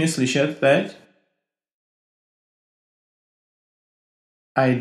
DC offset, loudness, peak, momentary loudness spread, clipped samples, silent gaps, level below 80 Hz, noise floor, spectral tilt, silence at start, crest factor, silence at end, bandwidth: under 0.1%; -20 LUFS; -4 dBFS; 8 LU; under 0.1%; 1.74-4.55 s; -74 dBFS; -79 dBFS; -5 dB/octave; 0 s; 22 dB; 0 s; 13 kHz